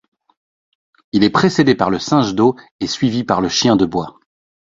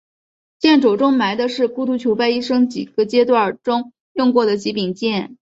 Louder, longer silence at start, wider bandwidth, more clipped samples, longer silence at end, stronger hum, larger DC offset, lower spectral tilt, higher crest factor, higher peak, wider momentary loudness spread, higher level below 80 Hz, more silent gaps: about the same, -16 LUFS vs -17 LUFS; first, 1.15 s vs 0.6 s; about the same, 7.8 kHz vs 7.8 kHz; neither; first, 0.55 s vs 0.1 s; neither; neither; about the same, -5 dB/octave vs -5.5 dB/octave; about the same, 16 dB vs 16 dB; about the same, 0 dBFS vs -2 dBFS; first, 10 LU vs 7 LU; first, -48 dBFS vs -62 dBFS; second, 2.71-2.79 s vs 4.00-4.15 s